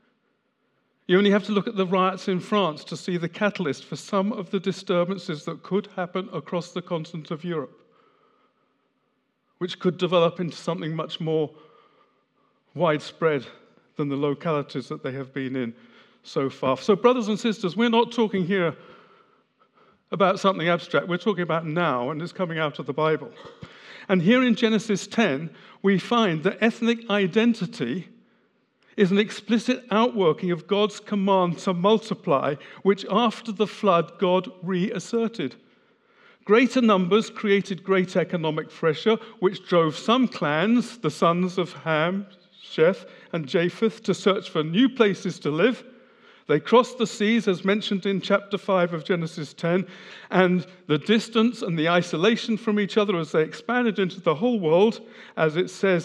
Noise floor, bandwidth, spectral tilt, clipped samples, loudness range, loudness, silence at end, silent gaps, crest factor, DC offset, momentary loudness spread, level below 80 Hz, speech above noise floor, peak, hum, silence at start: -72 dBFS; 11 kHz; -6 dB/octave; under 0.1%; 6 LU; -24 LUFS; 0 s; none; 22 dB; under 0.1%; 11 LU; -80 dBFS; 48 dB; -2 dBFS; none; 1.1 s